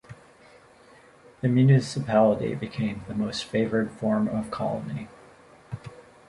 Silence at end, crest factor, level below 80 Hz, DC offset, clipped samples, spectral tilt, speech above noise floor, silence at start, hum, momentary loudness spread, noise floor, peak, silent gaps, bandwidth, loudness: 0.3 s; 20 dB; -56 dBFS; under 0.1%; under 0.1%; -7.5 dB/octave; 29 dB; 0.1 s; none; 20 LU; -53 dBFS; -6 dBFS; none; 11.5 kHz; -25 LUFS